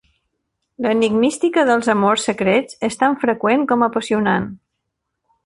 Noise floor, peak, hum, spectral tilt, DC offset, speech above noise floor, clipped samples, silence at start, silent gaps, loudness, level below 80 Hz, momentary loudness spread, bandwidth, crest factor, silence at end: -76 dBFS; -2 dBFS; none; -5 dB/octave; under 0.1%; 59 dB; under 0.1%; 0.8 s; none; -17 LUFS; -56 dBFS; 5 LU; 11.5 kHz; 16 dB; 0.9 s